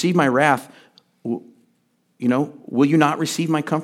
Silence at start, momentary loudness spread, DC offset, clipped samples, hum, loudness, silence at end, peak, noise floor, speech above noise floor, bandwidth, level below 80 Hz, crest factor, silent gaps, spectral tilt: 0 s; 13 LU; under 0.1%; under 0.1%; none; -20 LUFS; 0 s; 0 dBFS; -65 dBFS; 46 dB; 16 kHz; -74 dBFS; 20 dB; none; -5.5 dB/octave